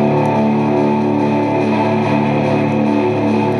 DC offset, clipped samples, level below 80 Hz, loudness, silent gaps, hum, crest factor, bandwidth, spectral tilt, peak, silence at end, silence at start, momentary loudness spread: under 0.1%; under 0.1%; -54 dBFS; -15 LUFS; none; none; 12 dB; 10 kHz; -8 dB/octave; -4 dBFS; 0 s; 0 s; 1 LU